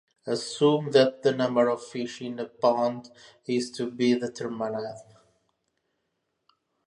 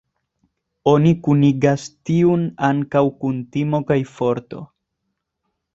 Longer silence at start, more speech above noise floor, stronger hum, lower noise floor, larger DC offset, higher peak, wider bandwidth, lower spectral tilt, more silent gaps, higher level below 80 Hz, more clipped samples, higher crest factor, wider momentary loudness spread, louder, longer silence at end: second, 0.25 s vs 0.85 s; second, 52 dB vs 59 dB; neither; about the same, -79 dBFS vs -76 dBFS; neither; second, -8 dBFS vs -2 dBFS; first, 11.5 kHz vs 7.8 kHz; second, -5.5 dB/octave vs -8 dB/octave; neither; second, -76 dBFS vs -54 dBFS; neither; about the same, 20 dB vs 18 dB; first, 13 LU vs 9 LU; second, -26 LUFS vs -18 LUFS; first, 1.85 s vs 1.1 s